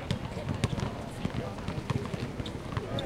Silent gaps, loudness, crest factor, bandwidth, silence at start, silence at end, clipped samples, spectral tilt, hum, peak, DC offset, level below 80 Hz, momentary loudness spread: none; -35 LUFS; 26 dB; 15.5 kHz; 0 s; 0 s; under 0.1%; -6 dB/octave; none; -8 dBFS; under 0.1%; -46 dBFS; 4 LU